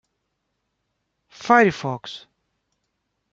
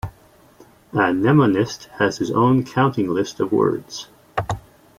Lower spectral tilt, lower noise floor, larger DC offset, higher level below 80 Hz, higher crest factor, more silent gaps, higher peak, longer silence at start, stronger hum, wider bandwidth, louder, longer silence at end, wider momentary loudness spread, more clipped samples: about the same, -5.5 dB/octave vs -6.5 dB/octave; first, -76 dBFS vs -51 dBFS; neither; second, -64 dBFS vs -50 dBFS; first, 24 dB vs 16 dB; neither; about the same, -2 dBFS vs -4 dBFS; first, 1.4 s vs 0.05 s; neither; second, 7.8 kHz vs 15.5 kHz; about the same, -19 LUFS vs -20 LUFS; first, 1.15 s vs 0.4 s; first, 21 LU vs 14 LU; neither